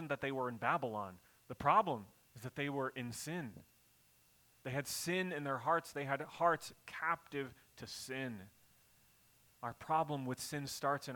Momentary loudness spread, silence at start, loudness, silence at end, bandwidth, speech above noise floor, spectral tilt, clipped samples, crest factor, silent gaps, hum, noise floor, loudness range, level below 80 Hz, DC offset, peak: 14 LU; 0 s; -39 LUFS; 0 s; 19 kHz; 31 dB; -4.5 dB/octave; under 0.1%; 22 dB; none; none; -70 dBFS; 5 LU; -74 dBFS; under 0.1%; -18 dBFS